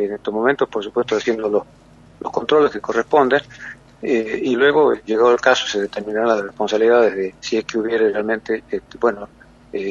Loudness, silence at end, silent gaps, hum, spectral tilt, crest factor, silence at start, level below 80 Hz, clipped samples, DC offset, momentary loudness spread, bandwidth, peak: -18 LUFS; 0 s; none; none; -4.5 dB/octave; 18 dB; 0 s; -56 dBFS; under 0.1%; under 0.1%; 13 LU; 7.6 kHz; 0 dBFS